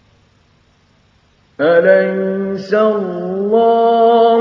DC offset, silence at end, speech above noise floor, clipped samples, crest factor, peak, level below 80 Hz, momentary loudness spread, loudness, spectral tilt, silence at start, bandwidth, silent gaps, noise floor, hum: under 0.1%; 0 s; 42 dB; under 0.1%; 14 dB; 0 dBFS; -62 dBFS; 9 LU; -13 LUFS; -7.5 dB/octave; 1.6 s; 6.2 kHz; none; -54 dBFS; none